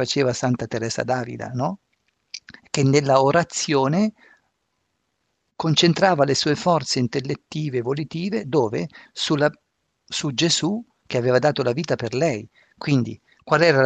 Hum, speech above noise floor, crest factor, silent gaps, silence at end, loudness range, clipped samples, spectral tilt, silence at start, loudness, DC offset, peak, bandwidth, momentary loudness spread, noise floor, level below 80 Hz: none; 53 dB; 20 dB; none; 0 s; 3 LU; under 0.1%; -5 dB/octave; 0 s; -22 LUFS; under 0.1%; -2 dBFS; 9.4 kHz; 12 LU; -73 dBFS; -60 dBFS